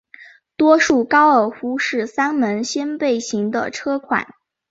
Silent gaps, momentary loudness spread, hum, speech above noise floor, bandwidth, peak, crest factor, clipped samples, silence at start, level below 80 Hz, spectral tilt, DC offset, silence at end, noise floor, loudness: none; 10 LU; none; 28 dB; 8 kHz; -2 dBFS; 16 dB; under 0.1%; 0.2 s; -60 dBFS; -4 dB/octave; under 0.1%; 0.45 s; -45 dBFS; -18 LUFS